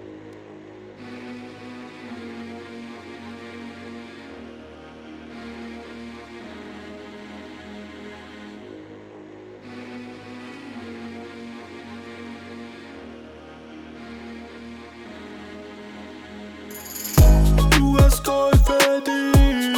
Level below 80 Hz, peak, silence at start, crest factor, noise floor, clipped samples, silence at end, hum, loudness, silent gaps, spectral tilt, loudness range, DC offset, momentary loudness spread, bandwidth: -26 dBFS; -6 dBFS; 0.05 s; 18 dB; -42 dBFS; under 0.1%; 0 s; none; -18 LUFS; none; -5.5 dB/octave; 20 LU; under 0.1%; 24 LU; 19.5 kHz